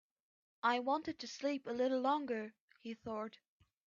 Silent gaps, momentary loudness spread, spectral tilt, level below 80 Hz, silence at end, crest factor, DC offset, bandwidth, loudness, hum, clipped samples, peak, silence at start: 2.60-2.68 s; 15 LU; -2 dB/octave; -80 dBFS; 0.6 s; 18 dB; under 0.1%; 7.6 kHz; -38 LUFS; none; under 0.1%; -22 dBFS; 0.65 s